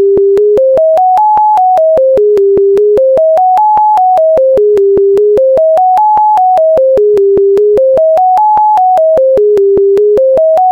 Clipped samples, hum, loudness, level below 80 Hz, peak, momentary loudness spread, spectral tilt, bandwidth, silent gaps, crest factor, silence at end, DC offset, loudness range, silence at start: under 0.1%; none; -7 LUFS; -42 dBFS; -2 dBFS; 0 LU; -7.5 dB/octave; 6 kHz; none; 4 dB; 0 s; 0.1%; 0 LU; 0 s